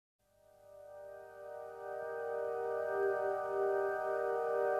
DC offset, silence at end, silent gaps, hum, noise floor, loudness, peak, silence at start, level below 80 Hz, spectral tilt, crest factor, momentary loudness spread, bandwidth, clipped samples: under 0.1%; 0 s; none; 50 Hz at -70 dBFS; -64 dBFS; -37 LUFS; -22 dBFS; 0.65 s; -80 dBFS; -6 dB/octave; 14 dB; 17 LU; 13.5 kHz; under 0.1%